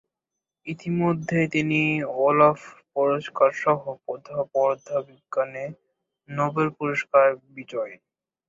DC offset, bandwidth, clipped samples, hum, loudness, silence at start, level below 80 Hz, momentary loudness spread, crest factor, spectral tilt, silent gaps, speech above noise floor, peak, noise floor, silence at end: under 0.1%; 7.6 kHz; under 0.1%; none; -24 LUFS; 0.65 s; -66 dBFS; 16 LU; 20 dB; -7 dB/octave; none; 63 dB; -4 dBFS; -86 dBFS; 0.55 s